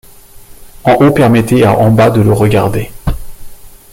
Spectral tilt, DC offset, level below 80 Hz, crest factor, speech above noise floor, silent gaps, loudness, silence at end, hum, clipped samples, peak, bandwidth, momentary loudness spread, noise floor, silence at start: -7.5 dB/octave; under 0.1%; -28 dBFS; 10 dB; 27 dB; none; -10 LUFS; 0.25 s; none; under 0.1%; 0 dBFS; 16.5 kHz; 13 LU; -35 dBFS; 0.35 s